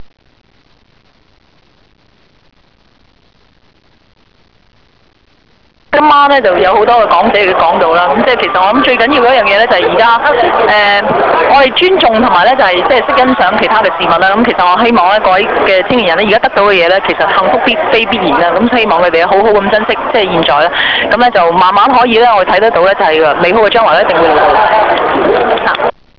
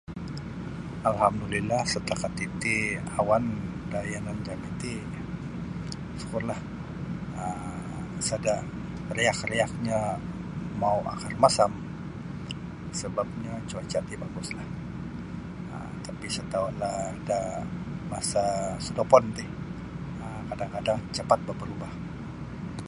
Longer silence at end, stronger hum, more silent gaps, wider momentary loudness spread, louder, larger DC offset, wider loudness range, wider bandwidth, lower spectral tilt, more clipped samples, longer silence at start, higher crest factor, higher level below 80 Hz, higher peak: first, 0.3 s vs 0 s; neither; neither; second, 3 LU vs 12 LU; first, -8 LUFS vs -30 LUFS; first, 0.3% vs under 0.1%; second, 2 LU vs 7 LU; second, 5.4 kHz vs 11.5 kHz; about the same, -6 dB/octave vs -5 dB/octave; neither; about the same, 0 s vs 0.1 s; second, 8 dB vs 26 dB; first, -40 dBFS vs -48 dBFS; about the same, 0 dBFS vs -2 dBFS